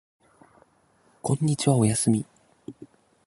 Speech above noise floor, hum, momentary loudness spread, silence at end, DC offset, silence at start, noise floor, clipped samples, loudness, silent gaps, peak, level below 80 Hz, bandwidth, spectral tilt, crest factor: 41 dB; none; 23 LU; 0.4 s; under 0.1%; 1.25 s; -63 dBFS; under 0.1%; -24 LUFS; none; -6 dBFS; -60 dBFS; 11.5 kHz; -5.5 dB/octave; 20 dB